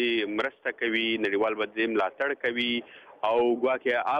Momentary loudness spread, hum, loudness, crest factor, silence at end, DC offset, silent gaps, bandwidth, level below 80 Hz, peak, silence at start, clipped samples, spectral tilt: 5 LU; none; -27 LUFS; 14 dB; 0 s; under 0.1%; none; 7 kHz; -72 dBFS; -12 dBFS; 0 s; under 0.1%; -5.5 dB/octave